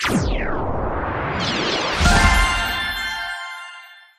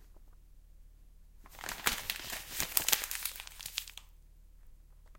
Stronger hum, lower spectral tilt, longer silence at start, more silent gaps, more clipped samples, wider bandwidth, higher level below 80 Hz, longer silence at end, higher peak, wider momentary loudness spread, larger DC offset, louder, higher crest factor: neither; first, -4 dB/octave vs 0.5 dB/octave; about the same, 0 s vs 0 s; neither; neither; about the same, 15.5 kHz vs 17 kHz; first, -26 dBFS vs -56 dBFS; first, 0.2 s vs 0 s; about the same, -2 dBFS vs -4 dBFS; about the same, 15 LU vs 17 LU; neither; first, -20 LUFS vs -34 LUFS; second, 18 dB vs 36 dB